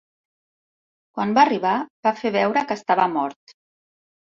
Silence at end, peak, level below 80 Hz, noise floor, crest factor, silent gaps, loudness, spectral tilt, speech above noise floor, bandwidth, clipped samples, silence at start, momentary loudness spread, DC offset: 1 s; -2 dBFS; -68 dBFS; under -90 dBFS; 20 dB; 1.90-2.03 s; -21 LUFS; -5.5 dB/octave; over 69 dB; 7.4 kHz; under 0.1%; 1.15 s; 10 LU; under 0.1%